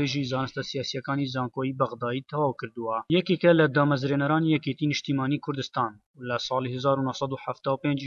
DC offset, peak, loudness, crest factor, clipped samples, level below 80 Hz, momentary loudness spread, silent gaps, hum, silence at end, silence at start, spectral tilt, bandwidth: under 0.1%; -8 dBFS; -27 LUFS; 18 dB; under 0.1%; -66 dBFS; 10 LU; 6.06-6.14 s; none; 0 s; 0 s; -6.5 dB/octave; 7.4 kHz